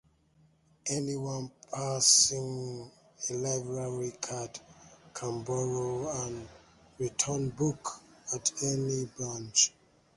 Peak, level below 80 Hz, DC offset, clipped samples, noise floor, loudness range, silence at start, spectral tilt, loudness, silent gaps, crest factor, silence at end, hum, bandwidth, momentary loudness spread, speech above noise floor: -8 dBFS; -64 dBFS; under 0.1%; under 0.1%; -66 dBFS; 8 LU; 0.85 s; -3 dB/octave; -30 LUFS; none; 26 dB; 0.45 s; none; 11.5 kHz; 15 LU; 34 dB